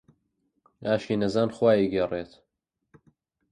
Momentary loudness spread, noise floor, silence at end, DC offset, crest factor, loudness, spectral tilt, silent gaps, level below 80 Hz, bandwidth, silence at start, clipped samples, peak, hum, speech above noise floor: 13 LU; -80 dBFS; 1.25 s; under 0.1%; 18 dB; -26 LUFS; -7 dB/octave; none; -60 dBFS; 10 kHz; 0.8 s; under 0.1%; -10 dBFS; none; 56 dB